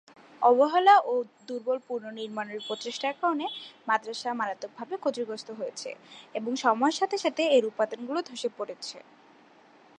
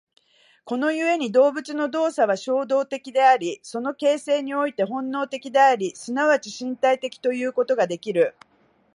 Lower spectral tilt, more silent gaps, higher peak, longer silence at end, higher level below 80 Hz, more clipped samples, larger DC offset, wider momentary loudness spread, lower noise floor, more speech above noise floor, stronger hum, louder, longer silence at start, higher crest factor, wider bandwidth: about the same, -3 dB/octave vs -4 dB/octave; neither; about the same, -8 dBFS vs -6 dBFS; first, 1 s vs 0.65 s; second, -88 dBFS vs -78 dBFS; neither; neither; first, 16 LU vs 9 LU; about the same, -57 dBFS vs -59 dBFS; second, 29 dB vs 37 dB; neither; second, -28 LUFS vs -22 LUFS; second, 0.4 s vs 0.65 s; about the same, 20 dB vs 16 dB; about the same, 10.5 kHz vs 11 kHz